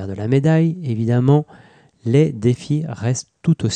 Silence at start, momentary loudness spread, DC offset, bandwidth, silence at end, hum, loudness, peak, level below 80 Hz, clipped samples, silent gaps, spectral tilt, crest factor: 0 s; 7 LU; under 0.1%; 9.4 kHz; 0 s; none; -18 LUFS; -4 dBFS; -56 dBFS; under 0.1%; none; -7 dB/octave; 14 dB